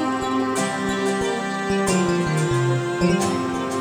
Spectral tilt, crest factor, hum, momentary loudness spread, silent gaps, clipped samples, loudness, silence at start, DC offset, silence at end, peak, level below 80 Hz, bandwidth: -5 dB/octave; 14 dB; none; 4 LU; none; under 0.1%; -22 LUFS; 0 s; under 0.1%; 0 s; -6 dBFS; -46 dBFS; over 20 kHz